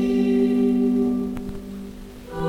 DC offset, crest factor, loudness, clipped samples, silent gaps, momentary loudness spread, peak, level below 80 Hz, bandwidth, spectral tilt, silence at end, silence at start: under 0.1%; 12 dB; -21 LUFS; under 0.1%; none; 17 LU; -10 dBFS; -42 dBFS; 11 kHz; -8 dB/octave; 0 s; 0 s